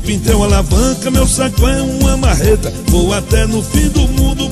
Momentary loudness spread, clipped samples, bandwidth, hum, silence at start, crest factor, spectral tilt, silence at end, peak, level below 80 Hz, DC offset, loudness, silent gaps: 2 LU; under 0.1%; 13.5 kHz; none; 0 s; 12 dB; -5 dB/octave; 0 s; 0 dBFS; -16 dBFS; under 0.1%; -13 LUFS; none